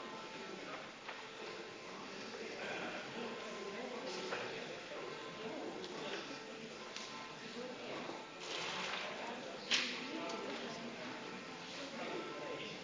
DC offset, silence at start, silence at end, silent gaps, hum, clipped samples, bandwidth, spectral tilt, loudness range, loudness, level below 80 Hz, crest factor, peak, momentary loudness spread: under 0.1%; 0 s; 0 s; none; none; under 0.1%; 7.8 kHz; -2.5 dB/octave; 5 LU; -44 LUFS; -82 dBFS; 26 dB; -18 dBFS; 7 LU